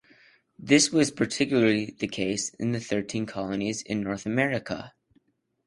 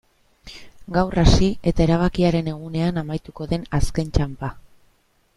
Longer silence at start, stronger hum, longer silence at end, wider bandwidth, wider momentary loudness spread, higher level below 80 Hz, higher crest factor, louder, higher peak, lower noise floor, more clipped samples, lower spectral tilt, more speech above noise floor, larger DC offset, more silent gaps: first, 0.6 s vs 0.45 s; neither; about the same, 0.8 s vs 0.75 s; about the same, 11.5 kHz vs 12 kHz; second, 11 LU vs 15 LU; second, -60 dBFS vs -28 dBFS; about the same, 22 dB vs 18 dB; second, -26 LUFS vs -22 LUFS; second, -6 dBFS vs -2 dBFS; first, -68 dBFS vs -61 dBFS; neither; second, -4 dB/octave vs -6.5 dB/octave; about the same, 42 dB vs 42 dB; neither; neither